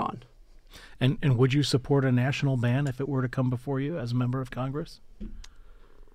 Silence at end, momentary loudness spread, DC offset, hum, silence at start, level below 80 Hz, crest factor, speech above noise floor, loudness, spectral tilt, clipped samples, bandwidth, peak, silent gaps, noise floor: 0.05 s; 20 LU; under 0.1%; none; 0 s; -48 dBFS; 16 dB; 26 dB; -27 LUFS; -7 dB/octave; under 0.1%; 10.5 kHz; -12 dBFS; none; -52 dBFS